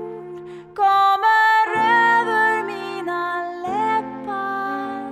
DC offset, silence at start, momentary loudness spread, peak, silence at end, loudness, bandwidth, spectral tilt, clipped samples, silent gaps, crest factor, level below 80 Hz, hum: under 0.1%; 0 s; 15 LU; -6 dBFS; 0 s; -19 LUFS; 14 kHz; -4 dB/octave; under 0.1%; none; 14 dB; -68 dBFS; none